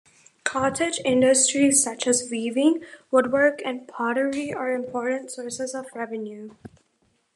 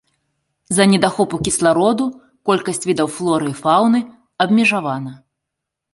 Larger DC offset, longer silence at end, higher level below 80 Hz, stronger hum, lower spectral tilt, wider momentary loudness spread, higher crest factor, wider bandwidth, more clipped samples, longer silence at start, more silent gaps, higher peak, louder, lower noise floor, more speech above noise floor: neither; about the same, 0.85 s vs 0.8 s; second, -66 dBFS vs -52 dBFS; neither; second, -2.5 dB/octave vs -4.5 dB/octave; first, 14 LU vs 11 LU; about the same, 20 dB vs 18 dB; first, 13 kHz vs 11.5 kHz; neither; second, 0.45 s vs 0.7 s; neither; second, -4 dBFS vs 0 dBFS; second, -23 LUFS vs -17 LUFS; second, -68 dBFS vs -80 dBFS; second, 45 dB vs 64 dB